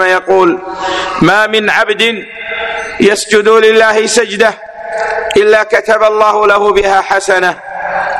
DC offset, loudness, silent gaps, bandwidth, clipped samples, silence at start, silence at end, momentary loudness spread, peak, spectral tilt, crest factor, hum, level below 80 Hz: under 0.1%; -10 LUFS; none; 13 kHz; 0.3%; 0 s; 0 s; 10 LU; 0 dBFS; -3 dB/octave; 10 dB; none; -42 dBFS